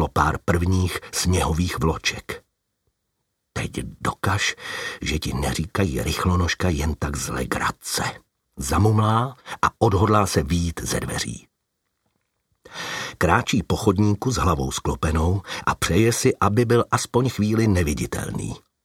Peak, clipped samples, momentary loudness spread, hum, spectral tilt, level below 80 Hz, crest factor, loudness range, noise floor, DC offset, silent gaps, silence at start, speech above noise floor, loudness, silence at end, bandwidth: 0 dBFS; under 0.1%; 10 LU; none; -5 dB/octave; -36 dBFS; 22 dB; 5 LU; -76 dBFS; under 0.1%; none; 0 s; 55 dB; -22 LUFS; 0.25 s; 16.5 kHz